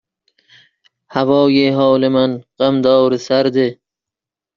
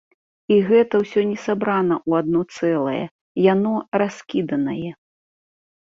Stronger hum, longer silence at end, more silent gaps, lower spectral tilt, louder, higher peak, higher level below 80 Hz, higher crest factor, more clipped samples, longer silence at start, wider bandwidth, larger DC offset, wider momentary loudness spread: neither; second, 0.85 s vs 1 s; second, none vs 3.11-3.35 s; second, -5 dB/octave vs -7.5 dB/octave; first, -14 LUFS vs -20 LUFS; about the same, -2 dBFS vs -4 dBFS; about the same, -58 dBFS vs -62 dBFS; about the same, 14 dB vs 16 dB; neither; first, 1.1 s vs 0.5 s; about the same, 7.2 kHz vs 7.6 kHz; neither; about the same, 7 LU vs 9 LU